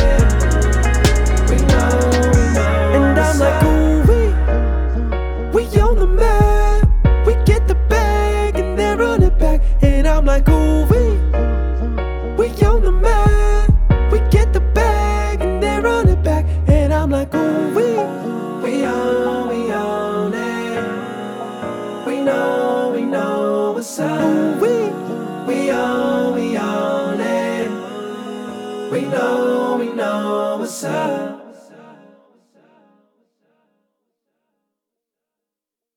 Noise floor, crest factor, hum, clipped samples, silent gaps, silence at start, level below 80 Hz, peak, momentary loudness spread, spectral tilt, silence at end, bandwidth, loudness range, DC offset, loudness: -86 dBFS; 14 dB; none; under 0.1%; none; 0 s; -18 dBFS; -2 dBFS; 9 LU; -6.5 dB/octave; 4.45 s; 15 kHz; 6 LU; under 0.1%; -17 LUFS